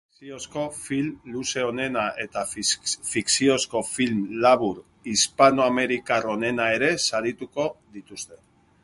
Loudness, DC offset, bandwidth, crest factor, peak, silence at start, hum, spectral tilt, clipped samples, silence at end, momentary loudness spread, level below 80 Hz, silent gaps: -23 LUFS; under 0.1%; 12 kHz; 22 dB; -2 dBFS; 0.2 s; none; -3 dB/octave; under 0.1%; 0.5 s; 16 LU; -60 dBFS; none